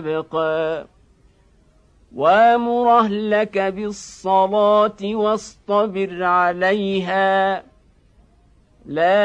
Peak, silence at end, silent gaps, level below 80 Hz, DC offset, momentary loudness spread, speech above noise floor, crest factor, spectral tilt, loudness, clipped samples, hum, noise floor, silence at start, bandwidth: -4 dBFS; 0 s; none; -56 dBFS; under 0.1%; 11 LU; 37 dB; 16 dB; -5.5 dB/octave; -18 LUFS; under 0.1%; none; -55 dBFS; 0 s; 9.8 kHz